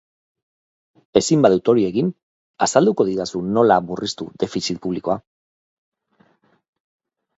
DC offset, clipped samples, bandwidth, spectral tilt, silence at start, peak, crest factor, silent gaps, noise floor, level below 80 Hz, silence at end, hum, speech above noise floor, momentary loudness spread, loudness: under 0.1%; under 0.1%; 8.2 kHz; -5 dB/octave; 1.15 s; 0 dBFS; 20 dB; 2.23-2.54 s; -60 dBFS; -58 dBFS; 2.2 s; none; 42 dB; 11 LU; -19 LUFS